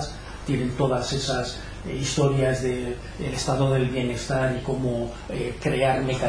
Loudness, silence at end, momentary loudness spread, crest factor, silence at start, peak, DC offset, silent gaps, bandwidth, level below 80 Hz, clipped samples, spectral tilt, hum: -25 LUFS; 0 s; 10 LU; 18 dB; 0 s; -8 dBFS; under 0.1%; none; 10.5 kHz; -40 dBFS; under 0.1%; -5.5 dB/octave; none